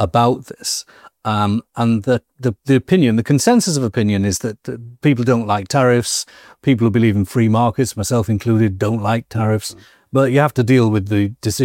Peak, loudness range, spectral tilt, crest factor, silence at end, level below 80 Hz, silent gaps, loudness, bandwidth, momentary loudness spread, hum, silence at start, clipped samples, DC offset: 0 dBFS; 1 LU; -6 dB/octave; 16 dB; 0 s; -48 dBFS; none; -17 LUFS; 17 kHz; 8 LU; none; 0 s; under 0.1%; under 0.1%